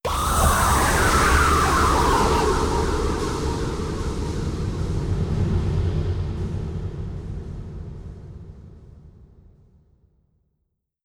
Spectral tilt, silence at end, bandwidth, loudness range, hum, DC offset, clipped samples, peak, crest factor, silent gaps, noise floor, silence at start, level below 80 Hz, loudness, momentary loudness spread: -4.5 dB/octave; 1.95 s; 19 kHz; 19 LU; none; under 0.1%; under 0.1%; -6 dBFS; 18 dB; none; -75 dBFS; 0.05 s; -30 dBFS; -22 LUFS; 18 LU